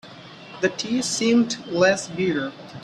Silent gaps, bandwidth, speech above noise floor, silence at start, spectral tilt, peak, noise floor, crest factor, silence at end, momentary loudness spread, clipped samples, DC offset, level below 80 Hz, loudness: none; 12 kHz; 20 dB; 0.05 s; -4 dB/octave; -4 dBFS; -42 dBFS; 18 dB; 0 s; 18 LU; under 0.1%; under 0.1%; -62 dBFS; -22 LUFS